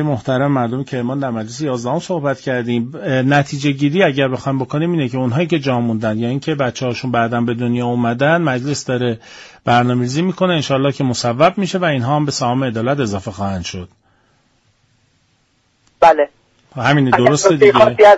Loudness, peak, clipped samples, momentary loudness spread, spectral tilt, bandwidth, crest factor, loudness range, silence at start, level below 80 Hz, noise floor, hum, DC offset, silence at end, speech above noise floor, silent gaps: -16 LUFS; 0 dBFS; under 0.1%; 10 LU; -6 dB/octave; 8 kHz; 16 dB; 4 LU; 0 s; -52 dBFS; -60 dBFS; none; under 0.1%; 0 s; 45 dB; none